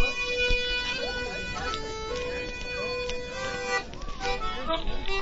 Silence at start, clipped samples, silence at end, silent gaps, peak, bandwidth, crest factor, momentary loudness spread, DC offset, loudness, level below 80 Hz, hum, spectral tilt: 0 s; under 0.1%; 0 s; none; -12 dBFS; 8 kHz; 18 dB; 8 LU; under 0.1%; -30 LUFS; -36 dBFS; none; -3 dB/octave